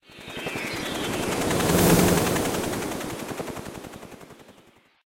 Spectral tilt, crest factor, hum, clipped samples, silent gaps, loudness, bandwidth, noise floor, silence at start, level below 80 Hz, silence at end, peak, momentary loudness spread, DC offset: -4.5 dB/octave; 22 dB; none; under 0.1%; none; -24 LUFS; 16 kHz; -56 dBFS; 0.1 s; -44 dBFS; 0.55 s; -4 dBFS; 21 LU; under 0.1%